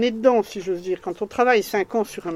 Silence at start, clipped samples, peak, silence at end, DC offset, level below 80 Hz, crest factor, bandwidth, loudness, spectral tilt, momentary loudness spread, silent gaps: 0 s; under 0.1%; -4 dBFS; 0 s; under 0.1%; -60 dBFS; 18 dB; 15.5 kHz; -22 LUFS; -4.5 dB/octave; 9 LU; none